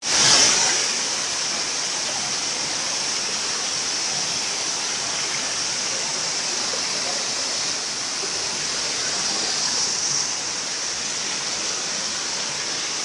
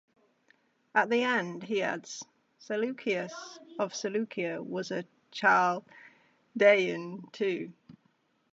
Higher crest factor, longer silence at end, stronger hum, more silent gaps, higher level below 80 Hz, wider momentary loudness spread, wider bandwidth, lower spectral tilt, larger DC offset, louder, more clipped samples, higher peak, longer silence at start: about the same, 20 dB vs 22 dB; second, 0 s vs 0.6 s; neither; neither; first, -62 dBFS vs -84 dBFS; second, 5 LU vs 19 LU; first, 12 kHz vs 8 kHz; second, 0.5 dB/octave vs -4 dB/octave; neither; first, -21 LUFS vs -30 LUFS; neither; first, -2 dBFS vs -8 dBFS; second, 0 s vs 0.95 s